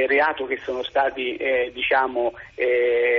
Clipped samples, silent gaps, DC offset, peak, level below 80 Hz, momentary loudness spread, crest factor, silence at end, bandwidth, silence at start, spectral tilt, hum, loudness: under 0.1%; none; under 0.1%; -10 dBFS; -56 dBFS; 7 LU; 12 dB; 0 s; 6.4 kHz; 0 s; 0 dB/octave; none; -22 LUFS